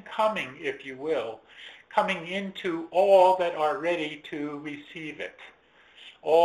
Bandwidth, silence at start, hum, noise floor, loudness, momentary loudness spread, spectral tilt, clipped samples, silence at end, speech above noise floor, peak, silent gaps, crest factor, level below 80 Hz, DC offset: 13 kHz; 0.05 s; none; -55 dBFS; -27 LUFS; 18 LU; -5 dB/octave; under 0.1%; 0 s; 28 dB; -8 dBFS; none; 18 dB; -72 dBFS; under 0.1%